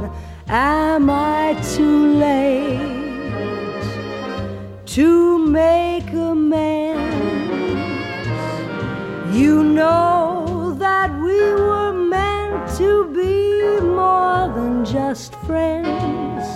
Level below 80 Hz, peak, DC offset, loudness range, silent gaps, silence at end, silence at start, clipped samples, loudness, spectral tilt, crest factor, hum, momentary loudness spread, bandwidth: -38 dBFS; -4 dBFS; under 0.1%; 3 LU; none; 0 s; 0 s; under 0.1%; -18 LUFS; -6.5 dB/octave; 14 dB; none; 11 LU; 13.5 kHz